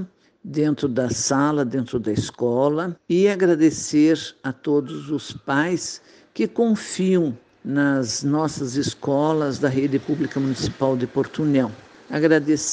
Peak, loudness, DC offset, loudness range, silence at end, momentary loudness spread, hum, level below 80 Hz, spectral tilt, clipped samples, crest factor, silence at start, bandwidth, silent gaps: -4 dBFS; -22 LUFS; under 0.1%; 2 LU; 0 s; 10 LU; none; -56 dBFS; -5.5 dB/octave; under 0.1%; 18 dB; 0 s; 9.8 kHz; none